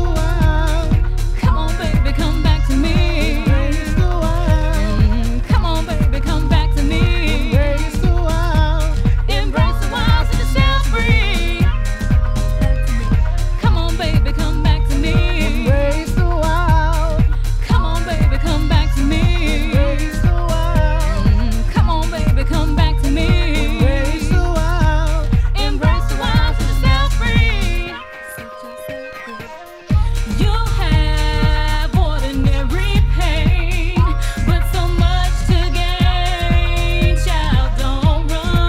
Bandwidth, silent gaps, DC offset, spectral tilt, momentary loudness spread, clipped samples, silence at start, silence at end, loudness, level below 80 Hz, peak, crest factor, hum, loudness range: 14 kHz; none; under 0.1%; -6 dB/octave; 3 LU; under 0.1%; 0 s; 0 s; -17 LUFS; -16 dBFS; 0 dBFS; 14 dB; none; 1 LU